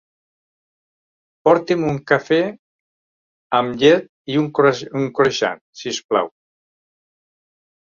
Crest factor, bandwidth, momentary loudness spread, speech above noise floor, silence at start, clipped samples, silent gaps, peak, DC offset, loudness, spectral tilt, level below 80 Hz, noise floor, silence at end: 20 dB; 7.4 kHz; 10 LU; over 73 dB; 1.45 s; under 0.1%; 2.59-3.50 s, 4.09-4.25 s, 5.61-5.73 s, 6.04-6.09 s; 0 dBFS; under 0.1%; -18 LUFS; -5 dB/octave; -60 dBFS; under -90 dBFS; 1.65 s